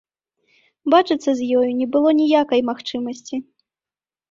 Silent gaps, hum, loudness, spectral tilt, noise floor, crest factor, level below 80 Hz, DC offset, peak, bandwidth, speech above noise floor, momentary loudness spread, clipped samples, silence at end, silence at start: none; none; -19 LUFS; -4.5 dB/octave; under -90 dBFS; 18 dB; -64 dBFS; under 0.1%; -2 dBFS; 7.6 kHz; over 72 dB; 13 LU; under 0.1%; 0.9 s; 0.85 s